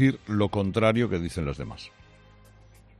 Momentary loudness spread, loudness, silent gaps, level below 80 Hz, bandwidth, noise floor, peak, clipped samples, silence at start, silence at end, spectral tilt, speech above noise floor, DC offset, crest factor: 16 LU; -26 LUFS; none; -48 dBFS; 12 kHz; -53 dBFS; -10 dBFS; under 0.1%; 0 s; 1.1 s; -7 dB/octave; 28 dB; under 0.1%; 18 dB